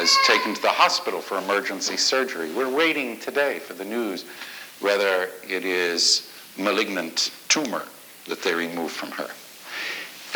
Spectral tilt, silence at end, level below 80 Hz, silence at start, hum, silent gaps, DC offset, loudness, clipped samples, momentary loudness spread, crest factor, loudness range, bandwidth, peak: -1 dB/octave; 0 s; -80 dBFS; 0 s; none; none; under 0.1%; -23 LUFS; under 0.1%; 15 LU; 22 dB; 3 LU; over 20 kHz; -4 dBFS